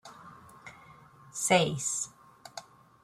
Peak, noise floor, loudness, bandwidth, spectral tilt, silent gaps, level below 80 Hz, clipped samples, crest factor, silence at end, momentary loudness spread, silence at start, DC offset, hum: -10 dBFS; -55 dBFS; -28 LUFS; 15.5 kHz; -3 dB/octave; none; -68 dBFS; under 0.1%; 24 dB; 0.45 s; 25 LU; 0.05 s; under 0.1%; none